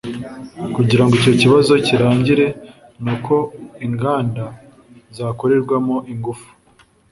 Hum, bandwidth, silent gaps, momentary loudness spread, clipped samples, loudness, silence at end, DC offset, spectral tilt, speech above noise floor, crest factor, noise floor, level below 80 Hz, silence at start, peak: none; 11.5 kHz; none; 17 LU; under 0.1%; -16 LUFS; 0.7 s; under 0.1%; -6.5 dB/octave; 37 dB; 16 dB; -53 dBFS; -48 dBFS; 0.05 s; -2 dBFS